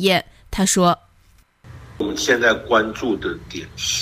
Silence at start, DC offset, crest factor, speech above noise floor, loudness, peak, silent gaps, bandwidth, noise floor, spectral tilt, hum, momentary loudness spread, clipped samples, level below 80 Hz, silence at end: 0 s; under 0.1%; 18 dB; 35 dB; -19 LUFS; -4 dBFS; none; 16 kHz; -54 dBFS; -3.5 dB/octave; none; 12 LU; under 0.1%; -44 dBFS; 0 s